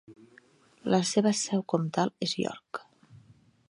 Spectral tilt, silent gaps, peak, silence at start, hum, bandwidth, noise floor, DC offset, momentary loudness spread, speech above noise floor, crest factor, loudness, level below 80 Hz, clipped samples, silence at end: -4.5 dB/octave; none; -10 dBFS; 0.1 s; none; 11.5 kHz; -60 dBFS; under 0.1%; 15 LU; 32 dB; 22 dB; -28 LUFS; -74 dBFS; under 0.1%; 0.55 s